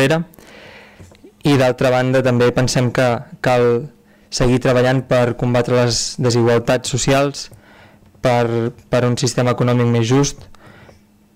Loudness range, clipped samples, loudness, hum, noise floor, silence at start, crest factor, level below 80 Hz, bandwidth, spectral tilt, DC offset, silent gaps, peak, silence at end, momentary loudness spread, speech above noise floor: 2 LU; under 0.1%; -16 LUFS; none; -48 dBFS; 0 s; 10 dB; -40 dBFS; 15.5 kHz; -5.5 dB/octave; under 0.1%; none; -8 dBFS; 0.9 s; 7 LU; 32 dB